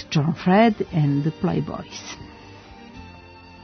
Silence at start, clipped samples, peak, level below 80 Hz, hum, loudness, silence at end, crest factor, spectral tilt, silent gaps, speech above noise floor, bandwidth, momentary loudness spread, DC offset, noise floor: 0 s; under 0.1%; -4 dBFS; -52 dBFS; none; -21 LUFS; 0 s; 18 dB; -7 dB/octave; none; 23 dB; 6.6 kHz; 26 LU; under 0.1%; -44 dBFS